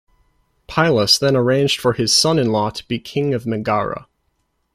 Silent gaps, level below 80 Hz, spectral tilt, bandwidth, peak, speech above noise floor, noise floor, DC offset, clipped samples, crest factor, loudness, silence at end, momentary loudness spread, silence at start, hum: none; -50 dBFS; -4 dB/octave; 16 kHz; -2 dBFS; 51 dB; -68 dBFS; under 0.1%; under 0.1%; 18 dB; -17 LUFS; 0.75 s; 11 LU; 0.7 s; none